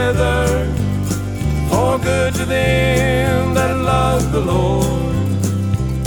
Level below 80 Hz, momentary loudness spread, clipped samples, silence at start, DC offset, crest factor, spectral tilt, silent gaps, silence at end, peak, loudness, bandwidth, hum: -26 dBFS; 5 LU; under 0.1%; 0 s; under 0.1%; 14 dB; -6 dB/octave; none; 0 s; -2 dBFS; -17 LUFS; over 20 kHz; none